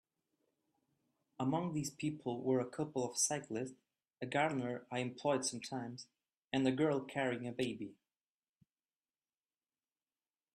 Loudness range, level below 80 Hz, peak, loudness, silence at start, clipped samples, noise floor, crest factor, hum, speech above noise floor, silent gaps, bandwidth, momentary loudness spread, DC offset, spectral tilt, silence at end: 4 LU; -80 dBFS; -20 dBFS; -38 LUFS; 1.4 s; under 0.1%; under -90 dBFS; 20 dB; none; over 52 dB; 6.44-6.48 s; 13.5 kHz; 12 LU; under 0.1%; -4.5 dB/octave; 2.6 s